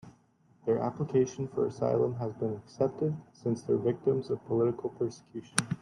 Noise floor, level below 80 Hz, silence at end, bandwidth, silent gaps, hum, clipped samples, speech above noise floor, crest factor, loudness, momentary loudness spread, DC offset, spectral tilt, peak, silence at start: -65 dBFS; -68 dBFS; 0.05 s; 12 kHz; none; none; under 0.1%; 34 dB; 28 dB; -32 LUFS; 7 LU; under 0.1%; -6 dB/octave; -4 dBFS; 0.05 s